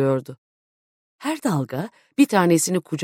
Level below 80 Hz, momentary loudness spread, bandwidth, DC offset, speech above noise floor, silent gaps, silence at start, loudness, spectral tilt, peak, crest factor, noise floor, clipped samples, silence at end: -66 dBFS; 13 LU; 16.5 kHz; under 0.1%; over 69 dB; 0.38-1.19 s; 0 s; -22 LUFS; -5 dB/octave; -4 dBFS; 18 dB; under -90 dBFS; under 0.1%; 0 s